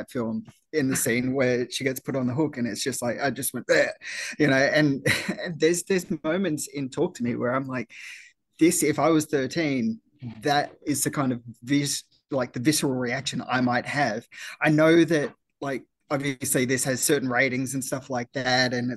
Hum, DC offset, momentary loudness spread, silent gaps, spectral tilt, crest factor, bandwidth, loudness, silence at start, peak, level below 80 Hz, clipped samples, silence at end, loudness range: none; under 0.1%; 11 LU; none; -4 dB/octave; 18 dB; 12.5 kHz; -25 LUFS; 0 s; -8 dBFS; -62 dBFS; under 0.1%; 0 s; 3 LU